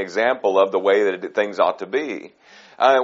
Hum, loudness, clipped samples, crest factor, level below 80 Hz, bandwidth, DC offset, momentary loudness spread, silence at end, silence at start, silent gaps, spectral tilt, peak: none; -20 LUFS; under 0.1%; 18 dB; -74 dBFS; 7.6 kHz; under 0.1%; 8 LU; 0 s; 0 s; none; -1.5 dB/octave; -2 dBFS